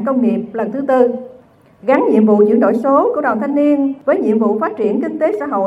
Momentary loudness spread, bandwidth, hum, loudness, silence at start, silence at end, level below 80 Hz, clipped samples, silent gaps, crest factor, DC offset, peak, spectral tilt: 7 LU; 7.6 kHz; none; -14 LUFS; 0 s; 0 s; -64 dBFS; under 0.1%; none; 14 dB; under 0.1%; 0 dBFS; -9 dB/octave